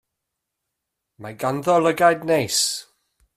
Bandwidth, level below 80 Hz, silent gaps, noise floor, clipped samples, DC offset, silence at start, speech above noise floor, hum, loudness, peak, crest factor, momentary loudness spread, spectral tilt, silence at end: 15.5 kHz; -64 dBFS; none; -81 dBFS; under 0.1%; under 0.1%; 1.2 s; 61 dB; none; -20 LUFS; -2 dBFS; 20 dB; 16 LU; -3 dB/octave; 0.55 s